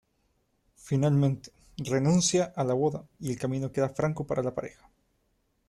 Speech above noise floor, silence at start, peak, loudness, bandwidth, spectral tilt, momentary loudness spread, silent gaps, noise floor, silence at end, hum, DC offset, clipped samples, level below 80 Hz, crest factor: 45 dB; 0.85 s; -12 dBFS; -28 LUFS; 12.5 kHz; -5.5 dB/octave; 14 LU; none; -73 dBFS; 1 s; none; under 0.1%; under 0.1%; -60 dBFS; 16 dB